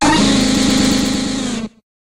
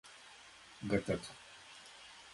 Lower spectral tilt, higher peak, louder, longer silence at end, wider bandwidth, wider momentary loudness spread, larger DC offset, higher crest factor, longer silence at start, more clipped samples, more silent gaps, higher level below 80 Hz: second, -3.5 dB/octave vs -5.5 dB/octave; first, -2 dBFS vs -18 dBFS; first, -14 LUFS vs -39 LUFS; first, 0.45 s vs 0 s; first, 16.5 kHz vs 11.5 kHz; second, 11 LU vs 19 LU; neither; second, 14 dB vs 24 dB; about the same, 0 s vs 0.05 s; neither; neither; first, -32 dBFS vs -64 dBFS